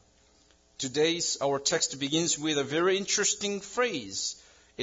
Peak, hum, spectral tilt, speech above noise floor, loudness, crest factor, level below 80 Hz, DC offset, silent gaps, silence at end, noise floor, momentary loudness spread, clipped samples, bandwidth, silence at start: -12 dBFS; none; -2 dB/octave; 34 dB; -28 LUFS; 18 dB; -68 dBFS; under 0.1%; none; 0 s; -63 dBFS; 7 LU; under 0.1%; 7.8 kHz; 0.8 s